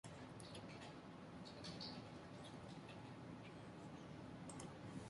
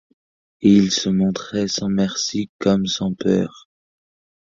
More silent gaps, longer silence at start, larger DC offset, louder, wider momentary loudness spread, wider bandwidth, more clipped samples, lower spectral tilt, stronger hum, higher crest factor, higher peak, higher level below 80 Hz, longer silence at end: second, none vs 2.49-2.59 s; second, 0.05 s vs 0.6 s; neither; second, -55 LUFS vs -19 LUFS; second, 5 LU vs 8 LU; first, 11.5 kHz vs 7.6 kHz; neither; about the same, -5 dB/octave vs -5 dB/octave; neither; about the same, 16 dB vs 18 dB; second, -38 dBFS vs -2 dBFS; second, -72 dBFS vs -52 dBFS; second, 0 s vs 0.9 s